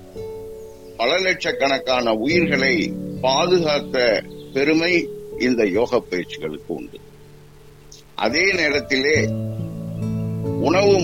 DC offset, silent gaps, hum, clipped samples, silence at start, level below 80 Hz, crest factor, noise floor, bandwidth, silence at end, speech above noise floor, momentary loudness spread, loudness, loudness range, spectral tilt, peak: 0.3%; none; none; under 0.1%; 0 s; -48 dBFS; 16 dB; -45 dBFS; 17 kHz; 0 s; 26 dB; 15 LU; -20 LUFS; 4 LU; -5 dB/octave; -4 dBFS